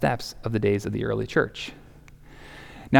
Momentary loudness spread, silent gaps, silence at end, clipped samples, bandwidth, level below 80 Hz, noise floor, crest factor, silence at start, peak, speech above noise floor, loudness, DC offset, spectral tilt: 20 LU; none; 0 s; under 0.1%; 18 kHz; -48 dBFS; -48 dBFS; 22 dB; 0 s; -4 dBFS; 22 dB; -27 LUFS; under 0.1%; -6.5 dB/octave